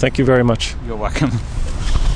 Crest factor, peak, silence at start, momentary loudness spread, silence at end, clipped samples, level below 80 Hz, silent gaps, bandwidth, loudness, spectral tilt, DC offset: 14 dB; -2 dBFS; 0 s; 11 LU; 0 s; under 0.1%; -20 dBFS; none; 10 kHz; -18 LUFS; -6 dB/octave; under 0.1%